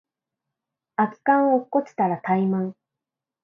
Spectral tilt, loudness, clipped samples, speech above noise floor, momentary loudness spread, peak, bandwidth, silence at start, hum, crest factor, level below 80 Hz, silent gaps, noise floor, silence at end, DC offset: -9.5 dB/octave; -23 LUFS; under 0.1%; 66 dB; 8 LU; -4 dBFS; 6.4 kHz; 1 s; none; 20 dB; -74 dBFS; none; -87 dBFS; 0.7 s; under 0.1%